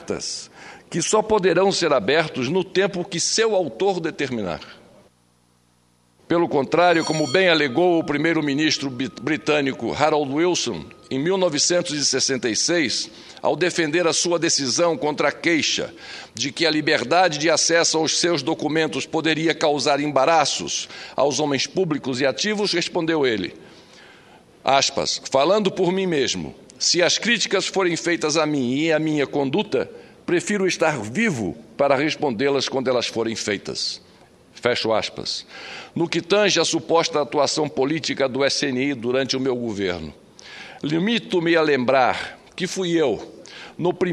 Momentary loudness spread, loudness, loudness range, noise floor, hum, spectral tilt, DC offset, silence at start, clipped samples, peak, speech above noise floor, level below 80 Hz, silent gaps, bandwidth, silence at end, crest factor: 10 LU; -21 LUFS; 4 LU; -60 dBFS; none; -3.5 dB/octave; under 0.1%; 0 s; under 0.1%; 0 dBFS; 40 dB; -60 dBFS; none; 11.5 kHz; 0 s; 20 dB